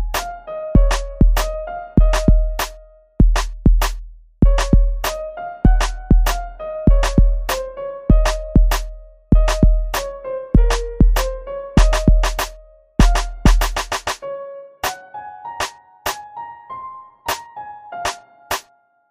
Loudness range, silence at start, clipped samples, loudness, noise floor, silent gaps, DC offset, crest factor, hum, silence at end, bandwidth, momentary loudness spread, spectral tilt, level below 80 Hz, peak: 9 LU; 0 s; under 0.1%; -20 LUFS; -53 dBFS; none; under 0.1%; 16 dB; none; 0.5 s; 15.5 kHz; 15 LU; -5.5 dB/octave; -18 dBFS; 0 dBFS